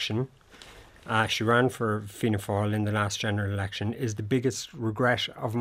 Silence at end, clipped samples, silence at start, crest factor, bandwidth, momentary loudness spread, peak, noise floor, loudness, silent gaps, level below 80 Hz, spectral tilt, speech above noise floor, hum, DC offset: 0 s; under 0.1%; 0 s; 22 dB; 16 kHz; 9 LU; -6 dBFS; -50 dBFS; -28 LUFS; none; -60 dBFS; -5 dB/octave; 23 dB; none; under 0.1%